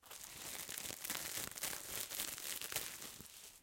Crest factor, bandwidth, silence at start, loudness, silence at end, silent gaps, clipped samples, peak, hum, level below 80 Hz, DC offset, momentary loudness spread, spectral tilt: 28 dB; 17 kHz; 0 s; -43 LUFS; 0 s; none; under 0.1%; -20 dBFS; none; -72 dBFS; under 0.1%; 9 LU; 0 dB/octave